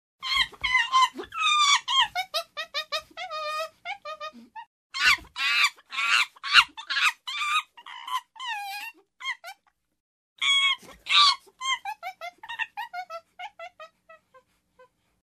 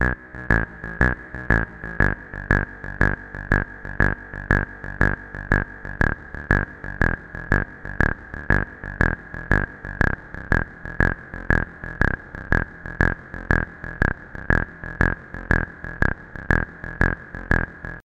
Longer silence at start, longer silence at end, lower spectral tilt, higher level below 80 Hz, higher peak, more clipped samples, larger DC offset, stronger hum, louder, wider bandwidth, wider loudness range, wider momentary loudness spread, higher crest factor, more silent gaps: first, 0.2 s vs 0 s; first, 1.1 s vs 0 s; second, 1.5 dB/octave vs -8 dB/octave; second, -62 dBFS vs -30 dBFS; about the same, -2 dBFS vs 0 dBFS; neither; neither; neither; about the same, -24 LUFS vs -24 LUFS; first, 14 kHz vs 8.4 kHz; first, 10 LU vs 1 LU; first, 21 LU vs 9 LU; about the same, 26 dB vs 24 dB; first, 4.67-4.90 s, 10.00-10.36 s vs none